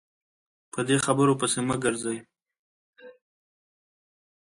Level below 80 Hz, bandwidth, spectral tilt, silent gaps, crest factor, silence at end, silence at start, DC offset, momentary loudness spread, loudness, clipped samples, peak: -64 dBFS; 11.5 kHz; -4.5 dB/octave; 2.59-2.93 s; 20 dB; 1.3 s; 0.75 s; under 0.1%; 12 LU; -25 LUFS; under 0.1%; -10 dBFS